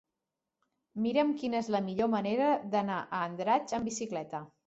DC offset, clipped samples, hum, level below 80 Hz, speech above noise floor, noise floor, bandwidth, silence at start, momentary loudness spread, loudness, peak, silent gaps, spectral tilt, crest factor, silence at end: under 0.1%; under 0.1%; none; -70 dBFS; 57 dB; -88 dBFS; 8.2 kHz; 0.95 s; 8 LU; -32 LUFS; -14 dBFS; none; -5 dB/octave; 18 dB; 0.2 s